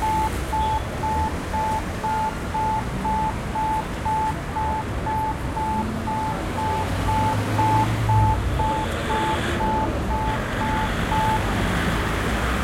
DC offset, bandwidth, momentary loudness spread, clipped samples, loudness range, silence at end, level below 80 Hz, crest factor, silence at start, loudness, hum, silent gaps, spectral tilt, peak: under 0.1%; 16.5 kHz; 5 LU; under 0.1%; 3 LU; 0 s; -32 dBFS; 16 dB; 0 s; -24 LUFS; none; none; -5.5 dB/octave; -8 dBFS